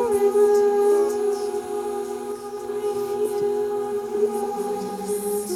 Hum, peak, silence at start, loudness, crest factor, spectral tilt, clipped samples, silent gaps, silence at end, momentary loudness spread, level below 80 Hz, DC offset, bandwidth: none; -8 dBFS; 0 s; -23 LUFS; 14 dB; -4.5 dB/octave; under 0.1%; none; 0 s; 11 LU; -62 dBFS; under 0.1%; 15.5 kHz